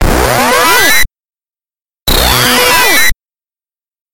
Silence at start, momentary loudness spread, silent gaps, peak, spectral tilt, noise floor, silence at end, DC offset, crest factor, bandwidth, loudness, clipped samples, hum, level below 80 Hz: 0 s; 6 LU; 4.01-4.06 s; 0 dBFS; -2 dB/octave; under -90 dBFS; 0 s; under 0.1%; 10 dB; over 20 kHz; -7 LUFS; 0.4%; none; -20 dBFS